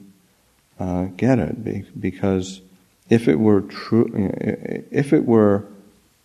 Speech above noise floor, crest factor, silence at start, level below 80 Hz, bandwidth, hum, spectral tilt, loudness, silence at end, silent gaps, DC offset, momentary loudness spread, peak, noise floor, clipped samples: 41 dB; 20 dB; 0.8 s; -52 dBFS; 12 kHz; none; -8 dB/octave; -20 LUFS; 0.5 s; none; under 0.1%; 12 LU; 0 dBFS; -60 dBFS; under 0.1%